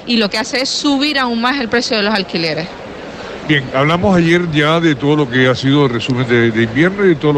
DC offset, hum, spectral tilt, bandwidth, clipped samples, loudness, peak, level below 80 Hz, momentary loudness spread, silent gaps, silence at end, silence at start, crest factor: under 0.1%; none; -5.5 dB/octave; 11.5 kHz; under 0.1%; -13 LUFS; -2 dBFS; -44 dBFS; 7 LU; none; 0 s; 0 s; 12 dB